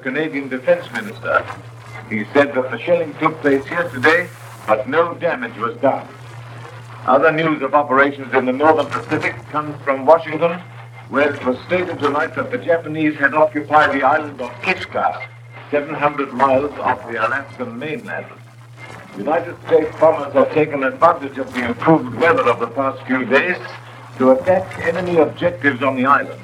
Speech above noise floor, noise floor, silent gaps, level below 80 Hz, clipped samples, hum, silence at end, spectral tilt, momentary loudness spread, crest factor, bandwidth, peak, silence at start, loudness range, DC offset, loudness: 21 dB; -38 dBFS; none; -58 dBFS; under 0.1%; none; 0 s; -6.5 dB/octave; 15 LU; 18 dB; 13 kHz; 0 dBFS; 0 s; 4 LU; under 0.1%; -17 LUFS